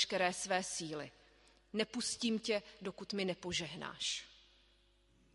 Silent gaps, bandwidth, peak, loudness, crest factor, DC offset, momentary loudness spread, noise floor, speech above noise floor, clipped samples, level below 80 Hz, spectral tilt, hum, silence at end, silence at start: none; 11.5 kHz; -18 dBFS; -39 LUFS; 22 dB; under 0.1%; 12 LU; -70 dBFS; 31 dB; under 0.1%; -70 dBFS; -2.5 dB/octave; none; 1 s; 0 s